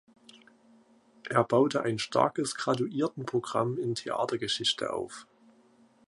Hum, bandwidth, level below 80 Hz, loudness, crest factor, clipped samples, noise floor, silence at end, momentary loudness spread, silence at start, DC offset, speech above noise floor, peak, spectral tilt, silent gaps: none; 11.5 kHz; -70 dBFS; -29 LUFS; 24 dB; under 0.1%; -62 dBFS; 0.85 s; 8 LU; 0.35 s; under 0.1%; 33 dB; -8 dBFS; -4.5 dB/octave; none